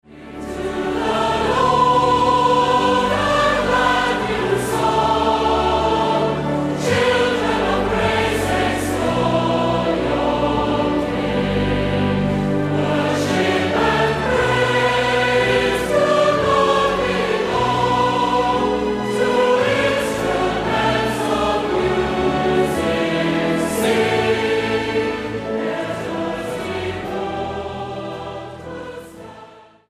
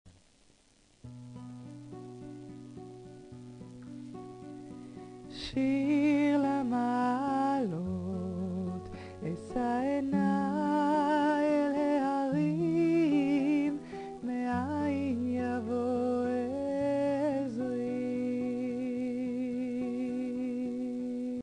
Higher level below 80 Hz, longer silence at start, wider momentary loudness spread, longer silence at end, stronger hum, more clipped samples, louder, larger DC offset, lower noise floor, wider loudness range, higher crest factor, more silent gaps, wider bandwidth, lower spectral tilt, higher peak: first, -38 dBFS vs -64 dBFS; about the same, 0.1 s vs 0.05 s; second, 9 LU vs 19 LU; first, 0.3 s vs 0 s; neither; neither; first, -18 LUFS vs -31 LUFS; neither; second, -43 dBFS vs -65 dBFS; second, 5 LU vs 18 LU; about the same, 14 dB vs 14 dB; neither; first, 15.5 kHz vs 10 kHz; second, -5 dB/octave vs -7.5 dB/octave; first, -4 dBFS vs -18 dBFS